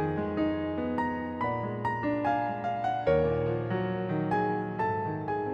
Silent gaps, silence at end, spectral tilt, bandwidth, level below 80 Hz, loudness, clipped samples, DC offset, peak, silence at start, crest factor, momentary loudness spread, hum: none; 0 s; -9 dB/octave; 8.2 kHz; -54 dBFS; -30 LUFS; under 0.1%; under 0.1%; -14 dBFS; 0 s; 16 dB; 5 LU; none